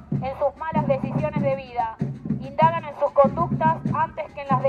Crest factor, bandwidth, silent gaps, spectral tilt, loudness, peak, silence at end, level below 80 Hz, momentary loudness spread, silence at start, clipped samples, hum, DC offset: 18 dB; 6.6 kHz; none; -9.5 dB/octave; -23 LUFS; -4 dBFS; 0 s; -48 dBFS; 9 LU; 0 s; under 0.1%; none; under 0.1%